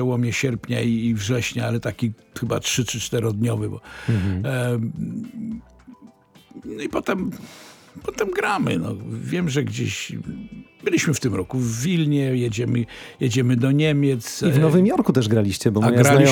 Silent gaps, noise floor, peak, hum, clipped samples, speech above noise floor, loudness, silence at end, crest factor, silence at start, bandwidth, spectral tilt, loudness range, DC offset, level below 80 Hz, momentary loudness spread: none; -50 dBFS; 0 dBFS; none; under 0.1%; 29 dB; -22 LUFS; 0 s; 20 dB; 0 s; 18.5 kHz; -5.5 dB/octave; 8 LU; under 0.1%; -52 dBFS; 13 LU